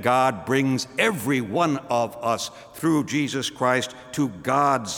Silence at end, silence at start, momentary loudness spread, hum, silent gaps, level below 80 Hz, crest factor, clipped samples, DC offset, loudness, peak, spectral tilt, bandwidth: 0 s; 0 s; 6 LU; none; none; -62 dBFS; 18 dB; under 0.1%; under 0.1%; -23 LUFS; -4 dBFS; -4.5 dB/octave; over 20 kHz